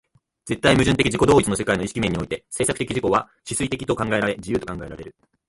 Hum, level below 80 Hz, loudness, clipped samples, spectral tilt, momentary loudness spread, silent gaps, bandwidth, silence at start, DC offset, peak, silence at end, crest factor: none; -42 dBFS; -21 LUFS; under 0.1%; -4.5 dB/octave; 13 LU; none; 11.5 kHz; 0.45 s; under 0.1%; -2 dBFS; 0.4 s; 20 dB